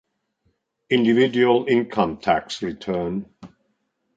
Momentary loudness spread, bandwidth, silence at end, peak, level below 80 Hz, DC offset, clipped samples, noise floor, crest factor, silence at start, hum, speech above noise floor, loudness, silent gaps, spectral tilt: 11 LU; 7.8 kHz; 0.7 s; -4 dBFS; -56 dBFS; under 0.1%; under 0.1%; -72 dBFS; 20 dB; 0.9 s; none; 51 dB; -21 LUFS; none; -6 dB/octave